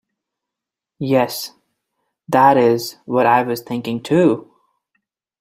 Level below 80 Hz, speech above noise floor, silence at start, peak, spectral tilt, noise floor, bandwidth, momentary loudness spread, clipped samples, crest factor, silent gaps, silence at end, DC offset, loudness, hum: -62 dBFS; 69 dB; 1 s; -2 dBFS; -6 dB/octave; -85 dBFS; 16 kHz; 13 LU; under 0.1%; 18 dB; none; 0.95 s; under 0.1%; -17 LUFS; none